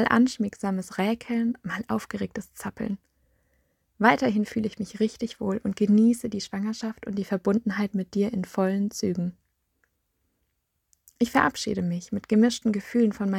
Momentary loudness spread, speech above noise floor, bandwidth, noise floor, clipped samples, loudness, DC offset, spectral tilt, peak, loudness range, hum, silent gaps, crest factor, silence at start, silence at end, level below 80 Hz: 11 LU; 51 dB; 15 kHz; -76 dBFS; under 0.1%; -26 LUFS; under 0.1%; -6 dB/octave; -4 dBFS; 5 LU; none; none; 22 dB; 0 s; 0 s; -60 dBFS